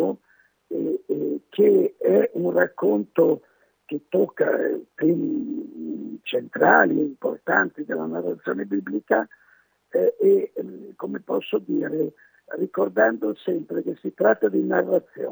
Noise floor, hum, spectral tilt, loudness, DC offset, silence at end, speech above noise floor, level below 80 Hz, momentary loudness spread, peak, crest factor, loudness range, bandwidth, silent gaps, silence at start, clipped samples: -62 dBFS; none; -9 dB/octave; -23 LUFS; under 0.1%; 0 s; 39 dB; -82 dBFS; 14 LU; -2 dBFS; 20 dB; 4 LU; over 20 kHz; none; 0 s; under 0.1%